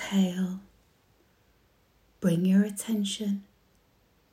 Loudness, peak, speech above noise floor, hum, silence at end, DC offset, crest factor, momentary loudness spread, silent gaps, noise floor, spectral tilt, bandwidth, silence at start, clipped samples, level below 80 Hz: -28 LUFS; -14 dBFS; 39 dB; none; 0.9 s; under 0.1%; 16 dB; 10 LU; none; -66 dBFS; -6 dB/octave; 15.5 kHz; 0 s; under 0.1%; -68 dBFS